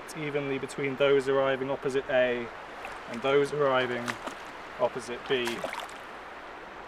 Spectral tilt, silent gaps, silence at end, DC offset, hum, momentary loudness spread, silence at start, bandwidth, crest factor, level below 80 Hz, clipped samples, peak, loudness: -4.5 dB/octave; none; 0 s; under 0.1%; none; 16 LU; 0 s; 15 kHz; 18 dB; -62 dBFS; under 0.1%; -10 dBFS; -29 LUFS